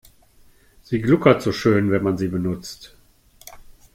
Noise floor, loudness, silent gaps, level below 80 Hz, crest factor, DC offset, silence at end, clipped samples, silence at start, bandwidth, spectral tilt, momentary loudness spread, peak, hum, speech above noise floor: -53 dBFS; -20 LUFS; none; -50 dBFS; 20 dB; under 0.1%; 0.25 s; under 0.1%; 0.9 s; 16.5 kHz; -7 dB/octave; 15 LU; -2 dBFS; none; 34 dB